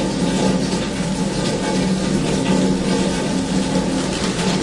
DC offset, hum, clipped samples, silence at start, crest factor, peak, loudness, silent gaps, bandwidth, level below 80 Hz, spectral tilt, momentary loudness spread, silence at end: under 0.1%; none; under 0.1%; 0 s; 14 dB; -4 dBFS; -19 LUFS; none; 11.5 kHz; -36 dBFS; -5 dB/octave; 3 LU; 0 s